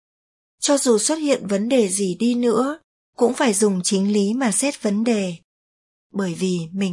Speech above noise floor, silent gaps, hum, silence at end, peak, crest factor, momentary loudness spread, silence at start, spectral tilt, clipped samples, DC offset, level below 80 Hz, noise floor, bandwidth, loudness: over 70 dB; 2.84-3.13 s, 5.44-6.10 s; none; 0 s; -4 dBFS; 16 dB; 8 LU; 0.6 s; -4.5 dB/octave; under 0.1%; under 0.1%; -70 dBFS; under -90 dBFS; 11.5 kHz; -20 LUFS